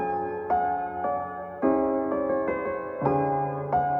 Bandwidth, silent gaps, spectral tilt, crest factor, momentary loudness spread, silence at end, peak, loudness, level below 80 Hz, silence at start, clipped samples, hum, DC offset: 5.4 kHz; none; -11 dB/octave; 18 dB; 5 LU; 0 s; -8 dBFS; -27 LUFS; -56 dBFS; 0 s; under 0.1%; none; under 0.1%